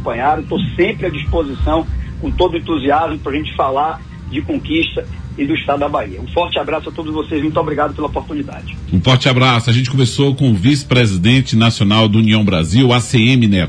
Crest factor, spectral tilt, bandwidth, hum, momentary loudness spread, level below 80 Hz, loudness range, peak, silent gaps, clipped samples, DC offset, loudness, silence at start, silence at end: 14 dB; -6 dB/octave; 10.5 kHz; none; 11 LU; -30 dBFS; 6 LU; 0 dBFS; none; under 0.1%; under 0.1%; -15 LUFS; 0 s; 0 s